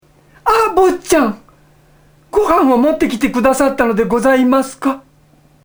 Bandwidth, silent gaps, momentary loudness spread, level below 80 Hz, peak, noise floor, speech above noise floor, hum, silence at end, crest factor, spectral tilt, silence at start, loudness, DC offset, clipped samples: over 20 kHz; none; 9 LU; -40 dBFS; 0 dBFS; -49 dBFS; 37 dB; none; 0.65 s; 14 dB; -4.5 dB/octave; 0.45 s; -14 LUFS; under 0.1%; under 0.1%